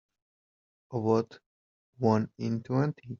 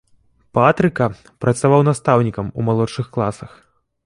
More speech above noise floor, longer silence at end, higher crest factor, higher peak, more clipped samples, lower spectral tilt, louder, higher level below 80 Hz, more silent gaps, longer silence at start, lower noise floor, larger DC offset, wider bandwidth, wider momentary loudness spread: first, over 61 dB vs 40 dB; second, 0.05 s vs 0.6 s; about the same, 20 dB vs 18 dB; second, -10 dBFS vs 0 dBFS; neither; first, -8.5 dB/octave vs -7 dB/octave; second, -30 LUFS vs -18 LUFS; second, -70 dBFS vs -48 dBFS; first, 1.46-1.93 s vs none; first, 0.9 s vs 0.55 s; first, under -90 dBFS vs -57 dBFS; neither; second, 7.2 kHz vs 11.5 kHz; about the same, 8 LU vs 9 LU